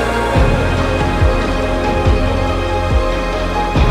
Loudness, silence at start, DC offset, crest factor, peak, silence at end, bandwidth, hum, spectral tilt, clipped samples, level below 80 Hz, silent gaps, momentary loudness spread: -16 LUFS; 0 s; under 0.1%; 14 dB; 0 dBFS; 0 s; 13 kHz; none; -6.5 dB/octave; under 0.1%; -18 dBFS; none; 3 LU